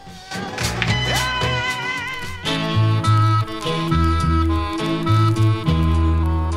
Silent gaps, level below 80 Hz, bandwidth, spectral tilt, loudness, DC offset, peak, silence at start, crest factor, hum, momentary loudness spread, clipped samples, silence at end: none; -28 dBFS; 15 kHz; -5.5 dB/octave; -19 LUFS; under 0.1%; -4 dBFS; 0 s; 16 dB; none; 7 LU; under 0.1%; 0 s